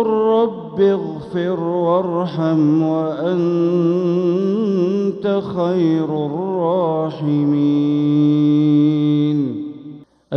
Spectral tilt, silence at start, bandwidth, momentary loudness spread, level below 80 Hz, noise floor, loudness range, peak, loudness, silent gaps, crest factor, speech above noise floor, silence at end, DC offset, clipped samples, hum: -9.5 dB/octave; 0 s; 6.2 kHz; 7 LU; -62 dBFS; -38 dBFS; 2 LU; -4 dBFS; -17 LUFS; none; 12 dB; 21 dB; 0 s; under 0.1%; under 0.1%; none